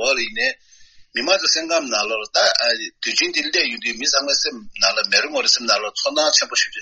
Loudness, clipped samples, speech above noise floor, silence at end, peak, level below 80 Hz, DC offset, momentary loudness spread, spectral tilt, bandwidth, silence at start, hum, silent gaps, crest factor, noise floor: -18 LUFS; under 0.1%; 28 dB; 0 s; -2 dBFS; -60 dBFS; under 0.1%; 6 LU; 1 dB/octave; 8.4 kHz; 0 s; none; none; 20 dB; -47 dBFS